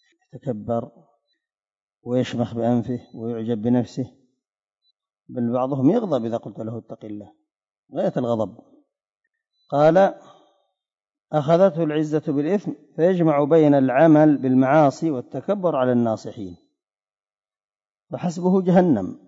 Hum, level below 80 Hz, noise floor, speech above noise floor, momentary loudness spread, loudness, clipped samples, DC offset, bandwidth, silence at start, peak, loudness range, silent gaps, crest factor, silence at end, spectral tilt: none; -68 dBFS; under -90 dBFS; over 70 dB; 18 LU; -20 LUFS; under 0.1%; under 0.1%; 7.8 kHz; 0.35 s; -6 dBFS; 9 LU; 1.82-1.87 s, 7.79-7.83 s; 16 dB; 0.1 s; -8.5 dB/octave